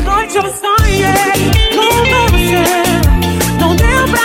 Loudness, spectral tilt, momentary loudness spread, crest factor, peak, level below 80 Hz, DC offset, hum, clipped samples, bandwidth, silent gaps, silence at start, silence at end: -11 LUFS; -4.5 dB/octave; 3 LU; 10 dB; 0 dBFS; -18 dBFS; under 0.1%; none; under 0.1%; 17.5 kHz; none; 0 s; 0 s